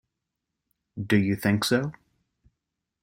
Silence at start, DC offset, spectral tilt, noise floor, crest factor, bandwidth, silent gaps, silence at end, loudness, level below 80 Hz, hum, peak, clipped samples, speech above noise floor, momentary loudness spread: 0.95 s; under 0.1%; -5.5 dB/octave; -84 dBFS; 20 dB; 16.5 kHz; none; 1.1 s; -25 LUFS; -60 dBFS; none; -8 dBFS; under 0.1%; 60 dB; 15 LU